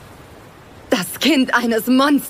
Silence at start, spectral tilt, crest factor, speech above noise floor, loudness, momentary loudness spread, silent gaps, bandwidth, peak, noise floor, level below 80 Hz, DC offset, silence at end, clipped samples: 0 s; -3.5 dB/octave; 16 dB; 26 dB; -17 LUFS; 7 LU; none; 16 kHz; -4 dBFS; -41 dBFS; -54 dBFS; under 0.1%; 0 s; under 0.1%